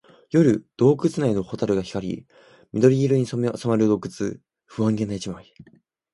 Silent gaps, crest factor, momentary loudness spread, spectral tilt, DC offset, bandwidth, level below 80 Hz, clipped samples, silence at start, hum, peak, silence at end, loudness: none; 20 dB; 13 LU; -7.5 dB/octave; under 0.1%; 11.5 kHz; -56 dBFS; under 0.1%; 0.35 s; none; -2 dBFS; 0.5 s; -22 LUFS